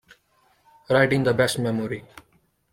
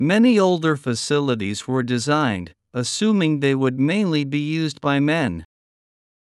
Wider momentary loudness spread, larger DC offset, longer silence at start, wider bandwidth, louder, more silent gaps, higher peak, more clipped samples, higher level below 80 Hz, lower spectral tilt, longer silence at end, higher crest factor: first, 12 LU vs 8 LU; neither; first, 0.9 s vs 0 s; first, 16.5 kHz vs 12 kHz; about the same, -22 LUFS vs -20 LUFS; neither; about the same, -4 dBFS vs -6 dBFS; neither; about the same, -56 dBFS vs -60 dBFS; about the same, -5.5 dB/octave vs -5.5 dB/octave; about the same, 0.7 s vs 0.8 s; first, 22 dB vs 14 dB